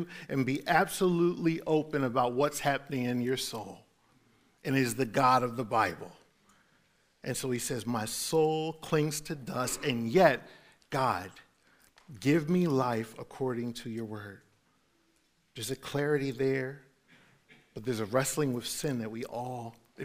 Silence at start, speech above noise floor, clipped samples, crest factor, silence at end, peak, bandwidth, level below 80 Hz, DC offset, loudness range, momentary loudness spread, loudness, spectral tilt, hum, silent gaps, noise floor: 0 s; 41 dB; under 0.1%; 24 dB; 0 s; -8 dBFS; 16 kHz; -64 dBFS; under 0.1%; 6 LU; 14 LU; -31 LUFS; -5 dB/octave; none; none; -71 dBFS